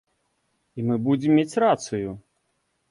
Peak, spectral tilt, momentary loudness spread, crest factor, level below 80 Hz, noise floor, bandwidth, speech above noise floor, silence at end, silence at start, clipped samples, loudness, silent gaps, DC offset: -8 dBFS; -6.5 dB/octave; 17 LU; 18 dB; -60 dBFS; -73 dBFS; 11.5 kHz; 51 dB; 0.7 s; 0.75 s; under 0.1%; -23 LUFS; none; under 0.1%